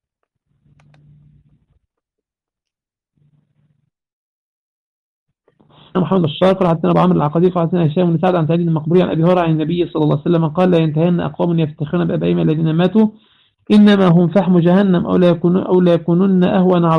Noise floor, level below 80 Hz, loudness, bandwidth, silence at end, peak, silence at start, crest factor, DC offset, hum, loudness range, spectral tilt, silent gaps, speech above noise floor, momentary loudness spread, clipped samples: -85 dBFS; -52 dBFS; -14 LUFS; 5.2 kHz; 0 s; -2 dBFS; 5.95 s; 12 dB; under 0.1%; none; 6 LU; -9.5 dB/octave; none; 72 dB; 5 LU; under 0.1%